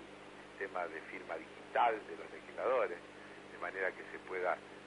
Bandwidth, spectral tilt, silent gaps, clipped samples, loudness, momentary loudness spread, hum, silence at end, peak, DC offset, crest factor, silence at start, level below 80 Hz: 11 kHz; -4.5 dB/octave; none; under 0.1%; -39 LUFS; 18 LU; 50 Hz at -65 dBFS; 0 s; -20 dBFS; under 0.1%; 20 dB; 0 s; -76 dBFS